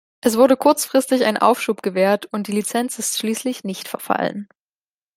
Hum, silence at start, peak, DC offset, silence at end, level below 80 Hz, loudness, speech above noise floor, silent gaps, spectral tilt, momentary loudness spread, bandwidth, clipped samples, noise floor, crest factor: none; 0.25 s; -2 dBFS; under 0.1%; 0.7 s; -66 dBFS; -19 LUFS; over 71 dB; none; -3.5 dB/octave; 11 LU; 16 kHz; under 0.1%; under -90 dBFS; 18 dB